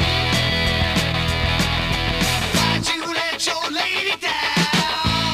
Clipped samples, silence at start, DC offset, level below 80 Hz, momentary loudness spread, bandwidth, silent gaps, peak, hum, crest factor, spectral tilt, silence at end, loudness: under 0.1%; 0 s; under 0.1%; -32 dBFS; 3 LU; 16 kHz; none; -8 dBFS; none; 12 dB; -3.5 dB/octave; 0 s; -19 LUFS